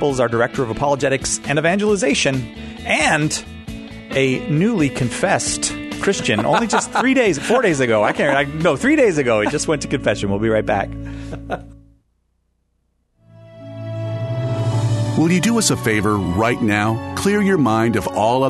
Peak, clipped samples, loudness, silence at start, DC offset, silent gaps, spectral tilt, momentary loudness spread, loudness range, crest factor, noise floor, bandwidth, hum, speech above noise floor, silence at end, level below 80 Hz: -2 dBFS; under 0.1%; -18 LUFS; 0 s; under 0.1%; none; -4.5 dB/octave; 12 LU; 9 LU; 16 dB; -66 dBFS; 12.5 kHz; none; 49 dB; 0 s; -42 dBFS